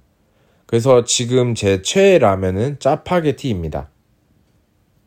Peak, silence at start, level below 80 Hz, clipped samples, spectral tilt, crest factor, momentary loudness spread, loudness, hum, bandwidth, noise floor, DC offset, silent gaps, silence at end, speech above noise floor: 0 dBFS; 0.7 s; -46 dBFS; under 0.1%; -5 dB/octave; 16 dB; 10 LU; -16 LUFS; none; 15.5 kHz; -59 dBFS; under 0.1%; none; 1.2 s; 43 dB